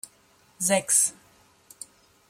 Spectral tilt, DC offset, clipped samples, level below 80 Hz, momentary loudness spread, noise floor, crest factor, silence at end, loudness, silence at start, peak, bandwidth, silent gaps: -2 dB/octave; under 0.1%; under 0.1%; -74 dBFS; 24 LU; -60 dBFS; 24 dB; 1.2 s; -22 LUFS; 0.6 s; -6 dBFS; 16.5 kHz; none